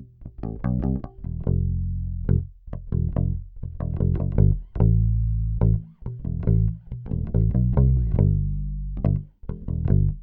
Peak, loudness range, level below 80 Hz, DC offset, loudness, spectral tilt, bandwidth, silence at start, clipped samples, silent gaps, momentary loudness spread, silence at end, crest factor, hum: -6 dBFS; 4 LU; -28 dBFS; under 0.1%; -24 LUFS; -14 dB/octave; 2.4 kHz; 0 s; under 0.1%; none; 14 LU; 0 s; 18 dB; none